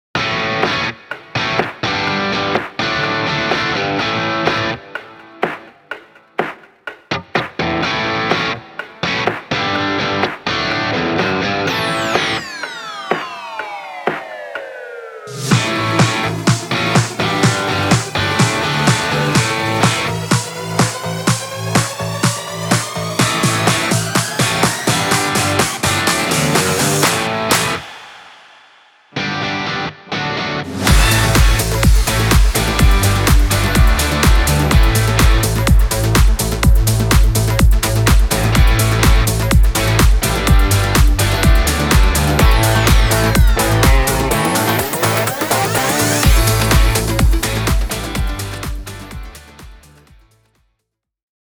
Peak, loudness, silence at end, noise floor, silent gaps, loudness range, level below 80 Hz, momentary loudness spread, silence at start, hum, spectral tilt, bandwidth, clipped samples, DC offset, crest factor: 0 dBFS; -15 LUFS; 1.8 s; -75 dBFS; none; 7 LU; -20 dBFS; 12 LU; 0.15 s; none; -4 dB/octave; over 20 kHz; under 0.1%; under 0.1%; 14 dB